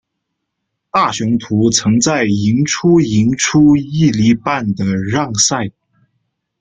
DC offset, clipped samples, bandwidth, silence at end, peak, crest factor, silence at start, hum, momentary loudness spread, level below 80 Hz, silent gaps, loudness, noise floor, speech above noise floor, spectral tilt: under 0.1%; under 0.1%; 9.6 kHz; 0.9 s; 0 dBFS; 14 dB; 0.95 s; none; 6 LU; -46 dBFS; none; -14 LUFS; -74 dBFS; 61 dB; -4.5 dB/octave